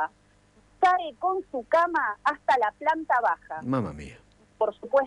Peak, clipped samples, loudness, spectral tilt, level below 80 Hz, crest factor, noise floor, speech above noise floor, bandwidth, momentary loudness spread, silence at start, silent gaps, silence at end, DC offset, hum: -10 dBFS; under 0.1%; -26 LUFS; -6 dB/octave; -58 dBFS; 16 dB; -60 dBFS; 34 dB; 11 kHz; 9 LU; 0 s; none; 0 s; under 0.1%; 50 Hz at -65 dBFS